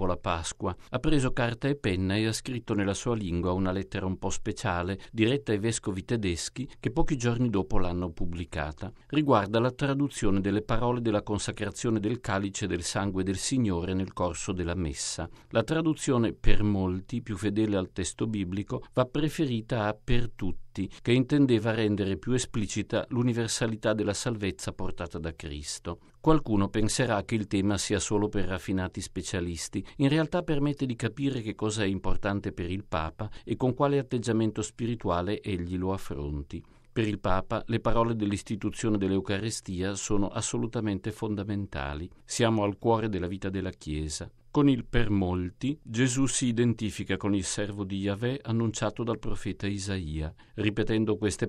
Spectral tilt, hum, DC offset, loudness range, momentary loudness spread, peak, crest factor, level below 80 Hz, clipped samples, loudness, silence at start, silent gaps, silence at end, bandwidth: -5.5 dB/octave; none; under 0.1%; 3 LU; 9 LU; -8 dBFS; 22 dB; -40 dBFS; under 0.1%; -30 LUFS; 0 s; none; 0 s; 12.5 kHz